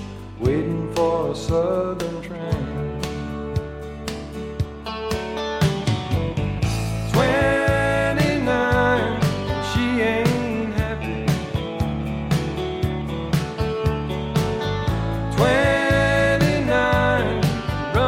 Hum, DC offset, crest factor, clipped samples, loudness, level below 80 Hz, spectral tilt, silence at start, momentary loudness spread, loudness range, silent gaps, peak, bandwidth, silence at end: none; under 0.1%; 16 dB; under 0.1%; -22 LUFS; -34 dBFS; -6 dB/octave; 0 s; 10 LU; 7 LU; none; -4 dBFS; 16.5 kHz; 0 s